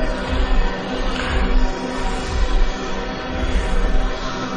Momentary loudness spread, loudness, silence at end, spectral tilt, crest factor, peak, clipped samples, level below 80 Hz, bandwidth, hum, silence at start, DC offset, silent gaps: 4 LU; -23 LUFS; 0 s; -5.5 dB/octave; 12 dB; -6 dBFS; under 0.1%; -20 dBFS; 9.4 kHz; none; 0 s; under 0.1%; none